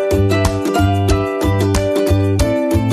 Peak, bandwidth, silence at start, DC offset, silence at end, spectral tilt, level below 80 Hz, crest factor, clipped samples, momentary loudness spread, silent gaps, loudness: -2 dBFS; 14.5 kHz; 0 s; under 0.1%; 0 s; -6.5 dB/octave; -24 dBFS; 12 dB; under 0.1%; 2 LU; none; -15 LUFS